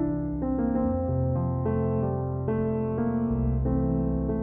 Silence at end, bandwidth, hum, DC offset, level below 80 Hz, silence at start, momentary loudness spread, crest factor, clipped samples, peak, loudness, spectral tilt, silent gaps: 0 s; 2.8 kHz; none; under 0.1%; -36 dBFS; 0 s; 3 LU; 12 dB; under 0.1%; -14 dBFS; -27 LUFS; -14 dB/octave; none